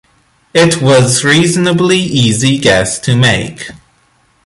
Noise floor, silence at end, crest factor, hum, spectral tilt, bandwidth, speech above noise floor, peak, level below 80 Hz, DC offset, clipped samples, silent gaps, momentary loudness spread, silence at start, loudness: -53 dBFS; 0.7 s; 12 dB; none; -4.5 dB/octave; 11.5 kHz; 43 dB; 0 dBFS; -40 dBFS; under 0.1%; under 0.1%; none; 8 LU; 0.55 s; -10 LUFS